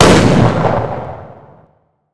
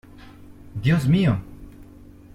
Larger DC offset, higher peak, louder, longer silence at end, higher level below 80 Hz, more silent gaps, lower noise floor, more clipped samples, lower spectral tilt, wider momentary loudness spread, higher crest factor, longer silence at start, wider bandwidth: neither; first, 0 dBFS vs -8 dBFS; first, -12 LUFS vs -21 LUFS; second, 0 s vs 0.5 s; first, -30 dBFS vs -44 dBFS; neither; first, -54 dBFS vs -45 dBFS; first, 0.9% vs under 0.1%; second, -5.5 dB/octave vs -7.5 dB/octave; about the same, 20 LU vs 19 LU; about the same, 12 dB vs 16 dB; second, 0 s vs 0.25 s; second, 11 kHz vs 13.5 kHz